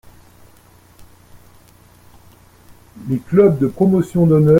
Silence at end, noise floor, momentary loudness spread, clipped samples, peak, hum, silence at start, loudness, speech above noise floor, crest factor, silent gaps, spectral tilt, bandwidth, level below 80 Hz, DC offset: 0 s; -48 dBFS; 11 LU; under 0.1%; 0 dBFS; 60 Hz at -50 dBFS; 1 s; -15 LUFS; 35 dB; 18 dB; none; -10 dB/octave; 16 kHz; -48 dBFS; under 0.1%